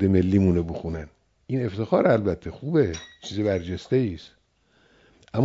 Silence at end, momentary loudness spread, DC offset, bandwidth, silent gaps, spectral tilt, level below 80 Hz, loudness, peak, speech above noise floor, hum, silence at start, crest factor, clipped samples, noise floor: 0 s; 14 LU; under 0.1%; 7.8 kHz; none; -8 dB/octave; -46 dBFS; -24 LUFS; -6 dBFS; 40 dB; none; 0 s; 18 dB; under 0.1%; -64 dBFS